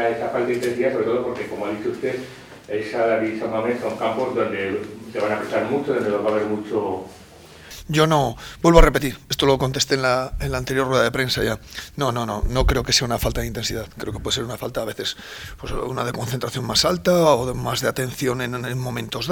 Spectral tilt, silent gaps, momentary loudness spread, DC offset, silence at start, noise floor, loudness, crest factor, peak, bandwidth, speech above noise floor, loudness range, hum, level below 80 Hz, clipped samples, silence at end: -4.5 dB/octave; none; 11 LU; under 0.1%; 0 s; -43 dBFS; -22 LUFS; 22 dB; 0 dBFS; 20 kHz; 21 dB; 5 LU; none; -32 dBFS; under 0.1%; 0 s